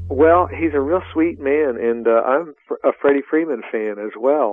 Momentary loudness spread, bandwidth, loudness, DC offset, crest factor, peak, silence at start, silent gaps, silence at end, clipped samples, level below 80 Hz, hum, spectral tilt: 9 LU; 3.7 kHz; -18 LUFS; under 0.1%; 16 dB; -2 dBFS; 0 s; none; 0 s; under 0.1%; -50 dBFS; none; -10 dB/octave